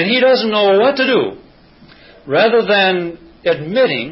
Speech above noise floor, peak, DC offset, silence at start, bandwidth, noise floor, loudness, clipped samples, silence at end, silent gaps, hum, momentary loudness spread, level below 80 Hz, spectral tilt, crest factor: 31 dB; -2 dBFS; under 0.1%; 0 s; 5.8 kHz; -44 dBFS; -14 LUFS; under 0.1%; 0 s; none; none; 9 LU; -56 dBFS; -9 dB/octave; 14 dB